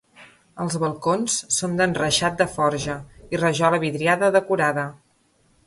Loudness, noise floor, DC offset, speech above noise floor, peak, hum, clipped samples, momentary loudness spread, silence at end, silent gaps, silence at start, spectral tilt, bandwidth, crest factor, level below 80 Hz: -22 LUFS; -62 dBFS; under 0.1%; 41 dB; -4 dBFS; none; under 0.1%; 10 LU; 0.7 s; none; 0.2 s; -3.5 dB/octave; 11.5 kHz; 18 dB; -54 dBFS